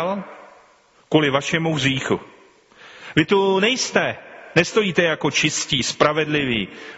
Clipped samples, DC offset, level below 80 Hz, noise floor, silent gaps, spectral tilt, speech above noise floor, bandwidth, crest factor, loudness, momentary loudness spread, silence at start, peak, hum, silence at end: under 0.1%; under 0.1%; -54 dBFS; -55 dBFS; none; -3 dB/octave; 35 dB; 8 kHz; 20 dB; -19 LUFS; 8 LU; 0 s; 0 dBFS; none; 0 s